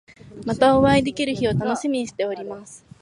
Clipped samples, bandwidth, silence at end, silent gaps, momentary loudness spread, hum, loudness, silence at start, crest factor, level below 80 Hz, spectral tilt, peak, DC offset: under 0.1%; 11 kHz; 0.25 s; none; 17 LU; none; -21 LUFS; 0.25 s; 18 dB; -46 dBFS; -6 dB/octave; -4 dBFS; under 0.1%